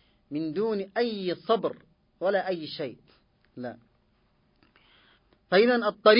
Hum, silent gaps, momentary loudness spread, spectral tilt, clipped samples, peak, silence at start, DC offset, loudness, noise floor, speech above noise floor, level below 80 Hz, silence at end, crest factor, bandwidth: none; none; 18 LU; -9 dB/octave; under 0.1%; -6 dBFS; 0.3 s; under 0.1%; -28 LUFS; -67 dBFS; 42 dB; -72 dBFS; 0 s; 24 dB; 5.4 kHz